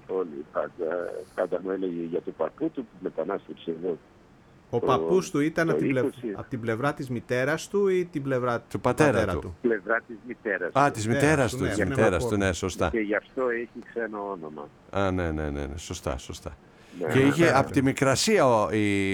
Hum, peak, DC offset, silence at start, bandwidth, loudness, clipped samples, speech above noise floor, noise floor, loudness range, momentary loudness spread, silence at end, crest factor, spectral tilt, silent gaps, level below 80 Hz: none; -6 dBFS; under 0.1%; 0.1 s; 18.5 kHz; -26 LUFS; under 0.1%; 28 dB; -54 dBFS; 7 LU; 12 LU; 0 s; 20 dB; -5.5 dB/octave; none; -48 dBFS